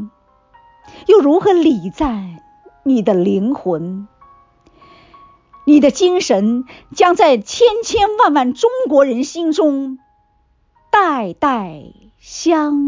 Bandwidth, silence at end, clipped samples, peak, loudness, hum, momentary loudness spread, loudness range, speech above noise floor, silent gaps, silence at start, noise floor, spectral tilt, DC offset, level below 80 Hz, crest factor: 7.6 kHz; 0 s; under 0.1%; -2 dBFS; -14 LUFS; none; 15 LU; 6 LU; 44 dB; none; 0 s; -58 dBFS; -5 dB/octave; under 0.1%; -46 dBFS; 14 dB